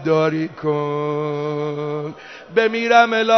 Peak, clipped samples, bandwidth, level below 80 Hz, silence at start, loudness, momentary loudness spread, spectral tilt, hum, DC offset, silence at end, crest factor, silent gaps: -2 dBFS; under 0.1%; 6.4 kHz; -66 dBFS; 0 s; -19 LUFS; 12 LU; -6 dB/octave; none; under 0.1%; 0 s; 18 dB; none